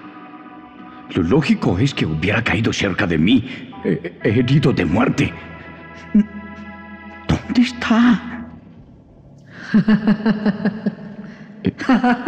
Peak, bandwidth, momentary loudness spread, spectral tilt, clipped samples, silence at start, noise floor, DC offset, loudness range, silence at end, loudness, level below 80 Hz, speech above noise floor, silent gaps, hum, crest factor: -6 dBFS; 8.8 kHz; 21 LU; -6.5 dB/octave; under 0.1%; 0.05 s; -44 dBFS; under 0.1%; 3 LU; 0 s; -18 LUFS; -44 dBFS; 28 dB; none; none; 12 dB